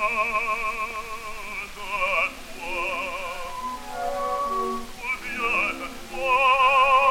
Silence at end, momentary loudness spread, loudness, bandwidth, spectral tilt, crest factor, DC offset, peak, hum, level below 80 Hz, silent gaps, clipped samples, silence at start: 0 s; 15 LU; -24 LUFS; 17 kHz; -2 dB/octave; 18 dB; under 0.1%; -8 dBFS; none; -44 dBFS; none; under 0.1%; 0 s